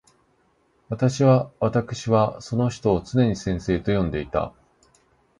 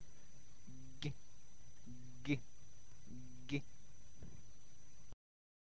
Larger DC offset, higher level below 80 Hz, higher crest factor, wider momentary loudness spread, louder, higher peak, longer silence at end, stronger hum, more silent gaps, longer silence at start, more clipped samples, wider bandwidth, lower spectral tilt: second, under 0.1% vs 0.7%; first, -44 dBFS vs -66 dBFS; second, 18 dB vs 28 dB; second, 8 LU vs 21 LU; first, -23 LUFS vs -49 LUFS; first, -4 dBFS vs -24 dBFS; first, 0.9 s vs 0.6 s; neither; neither; first, 0.9 s vs 0 s; neither; first, 10.5 kHz vs 8 kHz; first, -7 dB/octave vs -5.5 dB/octave